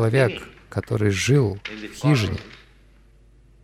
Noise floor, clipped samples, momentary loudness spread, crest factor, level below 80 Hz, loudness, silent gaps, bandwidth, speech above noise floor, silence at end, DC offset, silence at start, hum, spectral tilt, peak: -52 dBFS; under 0.1%; 15 LU; 16 dB; -48 dBFS; -22 LUFS; none; 14.5 kHz; 31 dB; 1.1 s; under 0.1%; 0 s; none; -6 dB/octave; -6 dBFS